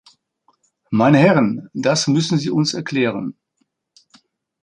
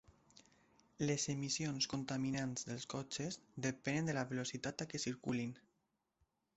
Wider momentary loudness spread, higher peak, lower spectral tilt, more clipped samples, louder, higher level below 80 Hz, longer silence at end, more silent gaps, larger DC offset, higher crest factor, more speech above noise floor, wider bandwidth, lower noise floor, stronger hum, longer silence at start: first, 10 LU vs 6 LU; first, -2 dBFS vs -24 dBFS; first, -5.5 dB/octave vs -4 dB/octave; neither; first, -17 LUFS vs -41 LUFS; first, -60 dBFS vs -72 dBFS; first, 1.3 s vs 0.95 s; neither; neither; about the same, 18 dB vs 18 dB; first, 53 dB vs 44 dB; first, 10.5 kHz vs 8.2 kHz; second, -69 dBFS vs -85 dBFS; neither; first, 0.9 s vs 0.35 s